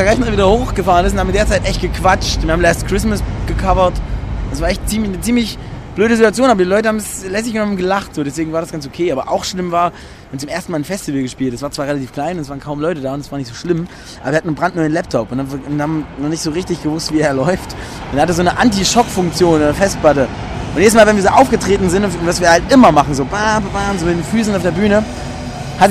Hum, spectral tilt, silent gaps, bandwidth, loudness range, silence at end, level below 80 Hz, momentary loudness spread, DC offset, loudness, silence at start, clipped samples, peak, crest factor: none; -5 dB/octave; none; 15.5 kHz; 8 LU; 0 s; -28 dBFS; 12 LU; under 0.1%; -15 LUFS; 0 s; under 0.1%; 0 dBFS; 14 dB